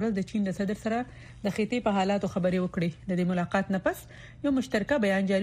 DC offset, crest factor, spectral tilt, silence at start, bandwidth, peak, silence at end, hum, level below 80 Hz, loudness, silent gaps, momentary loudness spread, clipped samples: under 0.1%; 16 dB; -6.5 dB/octave; 0 s; 15 kHz; -12 dBFS; 0 s; none; -54 dBFS; -29 LUFS; none; 7 LU; under 0.1%